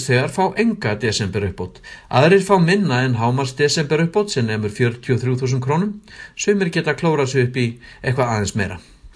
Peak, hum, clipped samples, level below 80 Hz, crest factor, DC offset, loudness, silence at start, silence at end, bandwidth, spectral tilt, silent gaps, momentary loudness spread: 0 dBFS; none; under 0.1%; -48 dBFS; 18 dB; under 0.1%; -19 LUFS; 0 s; 0.1 s; 11 kHz; -5.5 dB/octave; none; 11 LU